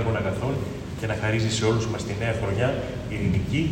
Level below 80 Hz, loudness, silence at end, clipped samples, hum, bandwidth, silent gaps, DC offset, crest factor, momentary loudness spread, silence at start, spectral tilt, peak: -42 dBFS; -26 LUFS; 0 s; under 0.1%; none; 15.5 kHz; none; under 0.1%; 16 dB; 7 LU; 0 s; -6 dB/octave; -10 dBFS